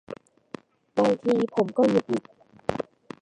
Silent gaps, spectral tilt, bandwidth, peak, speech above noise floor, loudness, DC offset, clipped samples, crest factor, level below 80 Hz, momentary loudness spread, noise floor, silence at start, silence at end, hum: none; -7 dB/octave; 10 kHz; -8 dBFS; 22 dB; -25 LUFS; under 0.1%; under 0.1%; 18 dB; -62 dBFS; 22 LU; -45 dBFS; 0.1 s; 0.4 s; none